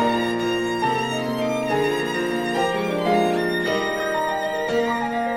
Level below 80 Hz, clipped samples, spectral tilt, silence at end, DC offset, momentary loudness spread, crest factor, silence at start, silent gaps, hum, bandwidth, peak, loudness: -54 dBFS; under 0.1%; -5 dB/octave; 0 s; under 0.1%; 3 LU; 14 dB; 0 s; none; none; 17 kHz; -8 dBFS; -22 LUFS